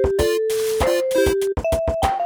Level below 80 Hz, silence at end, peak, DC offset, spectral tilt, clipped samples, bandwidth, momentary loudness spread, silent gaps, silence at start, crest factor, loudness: -32 dBFS; 0 s; -6 dBFS; under 0.1%; -5 dB/octave; under 0.1%; over 20 kHz; 3 LU; none; 0 s; 14 dB; -20 LUFS